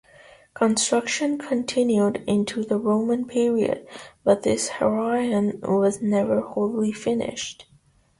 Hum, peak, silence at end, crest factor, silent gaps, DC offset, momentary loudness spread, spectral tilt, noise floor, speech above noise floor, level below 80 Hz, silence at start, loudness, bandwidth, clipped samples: none; -6 dBFS; 0.55 s; 18 dB; none; under 0.1%; 5 LU; -4.5 dB/octave; -59 dBFS; 36 dB; -60 dBFS; 0.55 s; -23 LUFS; 11.5 kHz; under 0.1%